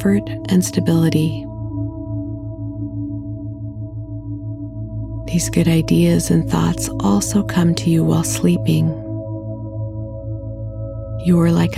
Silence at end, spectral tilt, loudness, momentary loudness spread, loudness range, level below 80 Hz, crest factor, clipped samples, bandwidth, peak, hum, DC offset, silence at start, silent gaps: 0 s; -6 dB/octave; -19 LUFS; 14 LU; 11 LU; -36 dBFS; 16 dB; under 0.1%; 15.5 kHz; -2 dBFS; none; under 0.1%; 0 s; none